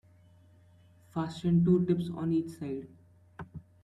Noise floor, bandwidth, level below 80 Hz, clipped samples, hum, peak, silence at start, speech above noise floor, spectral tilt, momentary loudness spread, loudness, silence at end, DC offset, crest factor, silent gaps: -60 dBFS; 9.6 kHz; -62 dBFS; under 0.1%; none; -14 dBFS; 1.15 s; 31 dB; -9 dB/octave; 22 LU; -30 LUFS; 0.25 s; under 0.1%; 18 dB; none